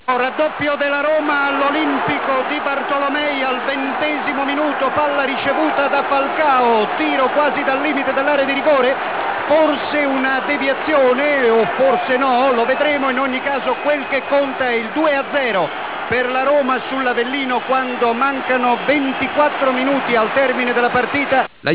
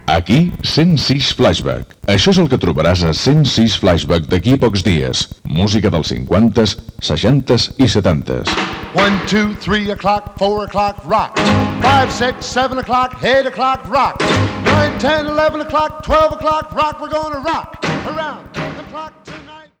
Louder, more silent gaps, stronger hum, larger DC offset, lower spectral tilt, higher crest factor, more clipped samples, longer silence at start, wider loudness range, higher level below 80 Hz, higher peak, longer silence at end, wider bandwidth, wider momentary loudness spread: about the same, -16 LUFS vs -14 LUFS; neither; neither; first, 0.4% vs under 0.1%; first, -7.5 dB/octave vs -5.5 dB/octave; about the same, 14 dB vs 12 dB; neither; about the same, 0.05 s vs 0.05 s; about the same, 2 LU vs 4 LU; second, -56 dBFS vs -34 dBFS; about the same, -2 dBFS vs -2 dBFS; second, 0 s vs 0.2 s; second, 4 kHz vs 16.5 kHz; second, 4 LU vs 8 LU